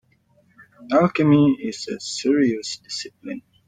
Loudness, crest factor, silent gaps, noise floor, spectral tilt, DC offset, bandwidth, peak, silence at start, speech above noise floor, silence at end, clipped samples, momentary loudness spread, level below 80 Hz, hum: -21 LUFS; 16 dB; none; -60 dBFS; -5.5 dB/octave; under 0.1%; 9.4 kHz; -6 dBFS; 0.8 s; 40 dB; 0.3 s; under 0.1%; 15 LU; -62 dBFS; none